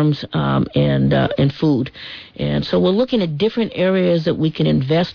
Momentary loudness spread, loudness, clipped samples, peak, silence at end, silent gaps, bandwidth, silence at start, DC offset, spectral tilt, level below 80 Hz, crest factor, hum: 5 LU; -18 LUFS; under 0.1%; -6 dBFS; 0 s; none; 5.4 kHz; 0 s; under 0.1%; -9 dB/octave; -42 dBFS; 12 dB; none